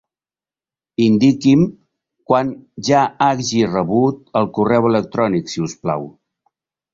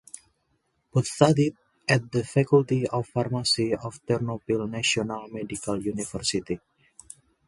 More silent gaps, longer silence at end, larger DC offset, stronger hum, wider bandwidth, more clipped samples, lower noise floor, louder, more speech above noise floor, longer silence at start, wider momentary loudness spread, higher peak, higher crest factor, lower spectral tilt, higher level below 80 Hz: neither; about the same, 0.85 s vs 0.9 s; neither; neither; second, 7.6 kHz vs 11.5 kHz; neither; first, under -90 dBFS vs -72 dBFS; first, -17 LUFS vs -26 LUFS; first, over 74 dB vs 47 dB; about the same, 1 s vs 0.95 s; about the same, 11 LU vs 13 LU; about the same, -2 dBFS vs -2 dBFS; second, 16 dB vs 24 dB; about the same, -6 dB/octave vs -5 dB/octave; about the same, -54 dBFS vs -58 dBFS